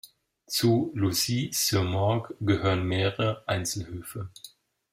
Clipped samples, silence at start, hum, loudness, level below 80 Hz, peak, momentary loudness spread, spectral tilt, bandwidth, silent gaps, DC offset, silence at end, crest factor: under 0.1%; 0.05 s; none; -27 LUFS; -58 dBFS; -10 dBFS; 13 LU; -4.5 dB/octave; 16 kHz; none; under 0.1%; 0.45 s; 18 dB